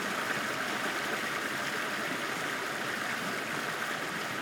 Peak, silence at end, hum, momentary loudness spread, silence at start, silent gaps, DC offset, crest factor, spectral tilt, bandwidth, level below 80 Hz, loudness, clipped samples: -18 dBFS; 0 s; none; 2 LU; 0 s; none; under 0.1%; 16 dB; -2.5 dB/octave; 17.5 kHz; -72 dBFS; -32 LUFS; under 0.1%